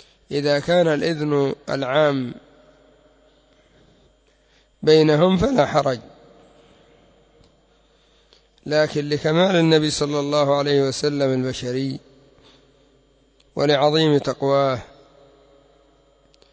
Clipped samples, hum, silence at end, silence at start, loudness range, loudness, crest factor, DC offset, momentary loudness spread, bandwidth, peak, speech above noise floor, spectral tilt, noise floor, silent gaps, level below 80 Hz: under 0.1%; none; 1.65 s; 0.3 s; 7 LU; -19 LUFS; 20 dB; under 0.1%; 10 LU; 8 kHz; -2 dBFS; 40 dB; -5.5 dB/octave; -59 dBFS; none; -52 dBFS